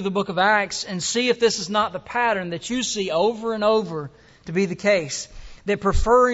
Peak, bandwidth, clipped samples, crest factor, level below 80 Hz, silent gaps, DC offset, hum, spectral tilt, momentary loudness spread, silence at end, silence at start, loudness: -6 dBFS; 8.2 kHz; under 0.1%; 16 dB; -36 dBFS; none; under 0.1%; none; -3.5 dB/octave; 12 LU; 0 s; 0 s; -22 LUFS